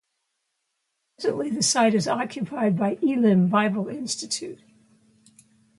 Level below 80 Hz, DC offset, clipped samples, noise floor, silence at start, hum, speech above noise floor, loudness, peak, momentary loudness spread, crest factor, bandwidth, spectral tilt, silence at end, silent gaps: -70 dBFS; under 0.1%; under 0.1%; -77 dBFS; 1.2 s; none; 54 dB; -23 LUFS; -6 dBFS; 10 LU; 18 dB; 11.5 kHz; -4.5 dB/octave; 1.25 s; none